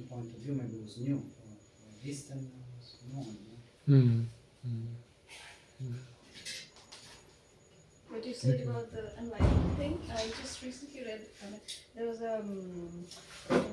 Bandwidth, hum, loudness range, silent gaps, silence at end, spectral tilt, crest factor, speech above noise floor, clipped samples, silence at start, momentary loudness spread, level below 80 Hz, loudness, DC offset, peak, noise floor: 12 kHz; none; 11 LU; none; 0 s; -6.5 dB/octave; 22 dB; 27 dB; under 0.1%; 0 s; 21 LU; -48 dBFS; -36 LUFS; under 0.1%; -12 dBFS; -61 dBFS